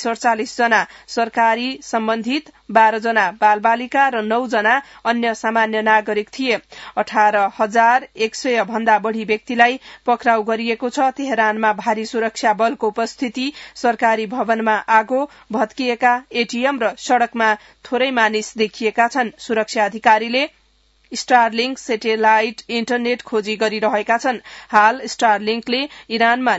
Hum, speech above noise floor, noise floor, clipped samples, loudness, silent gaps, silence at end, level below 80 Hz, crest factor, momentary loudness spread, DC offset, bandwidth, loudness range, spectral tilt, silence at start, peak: none; 40 dB; -57 dBFS; under 0.1%; -18 LUFS; none; 0 s; -62 dBFS; 18 dB; 8 LU; under 0.1%; 8 kHz; 2 LU; -3.5 dB/octave; 0 s; 0 dBFS